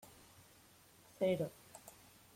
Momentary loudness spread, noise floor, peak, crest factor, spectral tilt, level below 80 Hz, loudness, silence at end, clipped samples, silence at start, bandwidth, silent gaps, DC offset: 26 LU; -65 dBFS; -24 dBFS; 20 dB; -6 dB/octave; -76 dBFS; -39 LUFS; 0.45 s; under 0.1%; 1.2 s; 16.5 kHz; none; under 0.1%